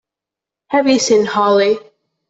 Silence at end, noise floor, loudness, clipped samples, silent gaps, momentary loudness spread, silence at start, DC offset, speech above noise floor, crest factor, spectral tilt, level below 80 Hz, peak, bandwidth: 0.5 s; -86 dBFS; -14 LUFS; under 0.1%; none; 6 LU; 0.7 s; under 0.1%; 73 dB; 14 dB; -3.5 dB/octave; -60 dBFS; -2 dBFS; 8 kHz